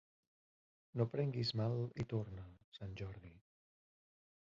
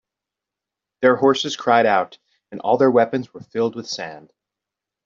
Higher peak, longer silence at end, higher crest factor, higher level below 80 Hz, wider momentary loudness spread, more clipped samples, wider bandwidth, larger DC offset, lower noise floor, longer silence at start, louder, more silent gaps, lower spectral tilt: second, -22 dBFS vs -2 dBFS; first, 1.05 s vs 0.85 s; about the same, 22 dB vs 18 dB; about the same, -66 dBFS vs -68 dBFS; first, 17 LU vs 14 LU; neither; about the same, 7.4 kHz vs 7.6 kHz; neither; first, under -90 dBFS vs -86 dBFS; about the same, 0.95 s vs 1 s; second, -42 LUFS vs -19 LUFS; first, 2.64-2.72 s vs none; first, -6.5 dB/octave vs -4.5 dB/octave